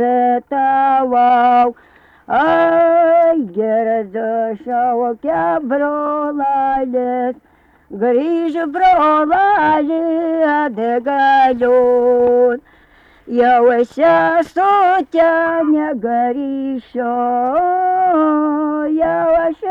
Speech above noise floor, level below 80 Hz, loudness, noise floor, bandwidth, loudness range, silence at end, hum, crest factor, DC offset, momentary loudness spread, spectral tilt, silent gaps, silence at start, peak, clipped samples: 34 dB; -52 dBFS; -14 LUFS; -48 dBFS; 7 kHz; 4 LU; 0 s; none; 10 dB; under 0.1%; 8 LU; -7 dB/octave; none; 0 s; -4 dBFS; under 0.1%